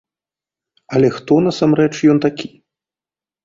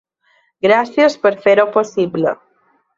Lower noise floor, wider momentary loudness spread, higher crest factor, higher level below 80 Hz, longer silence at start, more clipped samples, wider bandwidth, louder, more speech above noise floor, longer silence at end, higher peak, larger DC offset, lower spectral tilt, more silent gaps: first, under -90 dBFS vs -59 dBFS; about the same, 9 LU vs 7 LU; about the same, 16 dB vs 14 dB; first, -56 dBFS vs -62 dBFS; first, 0.9 s vs 0.65 s; neither; about the same, 7.6 kHz vs 7.6 kHz; about the same, -15 LUFS vs -15 LUFS; first, over 76 dB vs 45 dB; first, 1 s vs 0.65 s; about the same, -2 dBFS vs -2 dBFS; neither; first, -7 dB/octave vs -5.5 dB/octave; neither